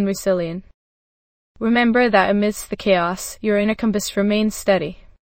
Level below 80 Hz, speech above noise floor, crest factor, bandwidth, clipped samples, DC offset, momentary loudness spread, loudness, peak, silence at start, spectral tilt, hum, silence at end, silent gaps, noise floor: -46 dBFS; over 71 dB; 18 dB; 16.5 kHz; under 0.1%; under 0.1%; 9 LU; -19 LUFS; -2 dBFS; 0 s; -5 dB/octave; none; 0.45 s; 0.74-1.55 s; under -90 dBFS